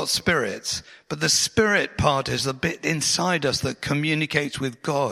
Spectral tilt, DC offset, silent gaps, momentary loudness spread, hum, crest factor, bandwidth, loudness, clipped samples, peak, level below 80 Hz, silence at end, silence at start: -3 dB/octave; under 0.1%; none; 9 LU; none; 20 dB; 16 kHz; -22 LUFS; under 0.1%; -4 dBFS; -48 dBFS; 0 s; 0 s